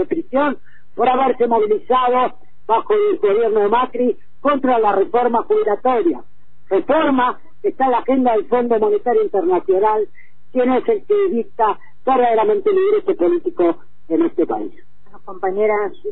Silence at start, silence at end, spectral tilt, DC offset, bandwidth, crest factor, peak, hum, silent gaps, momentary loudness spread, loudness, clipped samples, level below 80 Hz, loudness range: 0 s; 0 s; -9.5 dB/octave; 4%; 4.1 kHz; 12 dB; -4 dBFS; none; none; 7 LU; -17 LUFS; under 0.1%; -54 dBFS; 1 LU